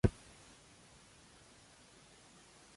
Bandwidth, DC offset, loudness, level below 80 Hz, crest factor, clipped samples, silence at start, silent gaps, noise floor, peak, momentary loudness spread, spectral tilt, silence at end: 11.5 kHz; under 0.1%; -46 LUFS; -52 dBFS; 30 dB; under 0.1%; 0.05 s; none; -62 dBFS; -14 dBFS; 3 LU; -7 dB/octave; 2.65 s